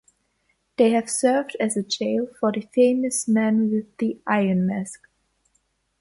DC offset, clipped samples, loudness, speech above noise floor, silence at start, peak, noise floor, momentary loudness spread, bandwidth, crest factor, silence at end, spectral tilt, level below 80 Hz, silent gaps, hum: under 0.1%; under 0.1%; -22 LUFS; 48 dB; 0.8 s; -6 dBFS; -70 dBFS; 7 LU; 11.5 kHz; 18 dB; 1.05 s; -5 dB/octave; -66 dBFS; none; none